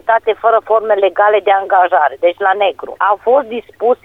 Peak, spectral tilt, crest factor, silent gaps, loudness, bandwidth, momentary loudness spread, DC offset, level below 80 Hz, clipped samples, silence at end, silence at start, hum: 0 dBFS; -5 dB/octave; 12 dB; none; -13 LUFS; 4 kHz; 5 LU; under 0.1%; -58 dBFS; under 0.1%; 0.1 s; 0.05 s; none